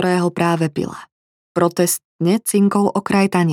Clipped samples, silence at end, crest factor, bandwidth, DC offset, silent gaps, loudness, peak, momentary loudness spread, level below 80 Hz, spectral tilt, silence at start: under 0.1%; 0 s; 16 dB; 17.5 kHz; under 0.1%; 1.12-1.55 s, 2.05-2.19 s; -18 LUFS; 0 dBFS; 10 LU; -60 dBFS; -5.5 dB/octave; 0 s